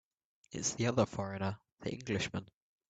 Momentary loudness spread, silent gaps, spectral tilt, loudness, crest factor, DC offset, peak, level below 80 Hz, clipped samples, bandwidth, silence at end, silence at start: 11 LU; 1.72-1.76 s; -4.5 dB/octave; -37 LUFS; 22 dB; under 0.1%; -16 dBFS; -66 dBFS; under 0.1%; 9.2 kHz; 0.45 s; 0.5 s